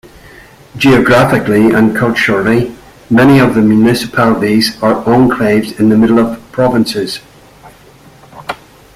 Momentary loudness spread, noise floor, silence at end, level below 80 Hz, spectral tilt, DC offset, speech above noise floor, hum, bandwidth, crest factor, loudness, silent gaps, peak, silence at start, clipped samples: 13 LU; -40 dBFS; 0.4 s; -40 dBFS; -6 dB/octave; under 0.1%; 31 dB; none; 15 kHz; 10 dB; -10 LUFS; none; 0 dBFS; 0.75 s; under 0.1%